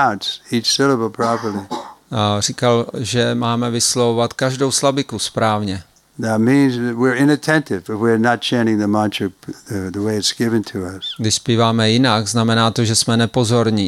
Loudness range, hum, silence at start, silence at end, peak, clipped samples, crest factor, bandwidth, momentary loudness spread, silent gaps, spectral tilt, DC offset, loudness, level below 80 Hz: 2 LU; none; 0 s; 0 s; 0 dBFS; under 0.1%; 16 dB; 15 kHz; 11 LU; none; -4.5 dB/octave; under 0.1%; -17 LUFS; -56 dBFS